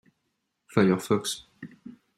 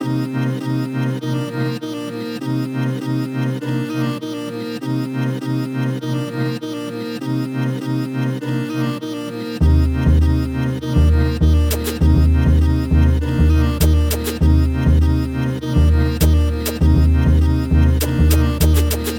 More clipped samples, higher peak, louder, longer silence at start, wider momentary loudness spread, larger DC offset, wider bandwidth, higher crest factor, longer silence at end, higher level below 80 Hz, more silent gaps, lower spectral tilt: neither; second, -8 dBFS vs -2 dBFS; second, -26 LUFS vs -18 LUFS; first, 0.7 s vs 0 s; first, 22 LU vs 9 LU; neither; second, 15.5 kHz vs 19 kHz; first, 22 dB vs 14 dB; first, 0.25 s vs 0 s; second, -66 dBFS vs -20 dBFS; neither; second, -5.5 dB/octave vs -7 dB/octave